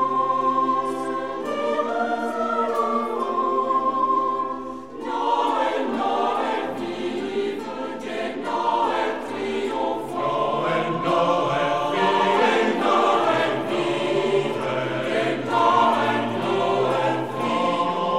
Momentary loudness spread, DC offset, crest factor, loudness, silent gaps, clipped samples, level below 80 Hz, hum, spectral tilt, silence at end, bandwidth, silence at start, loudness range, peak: 9 LU; 0.4%; 16 dB; -23 LUFS; none; under 0.1%; -60 dBFS; none; -5 dB/octave; 0 s; 14.5 kHz; 0 s; 5 LU; -6 dBFS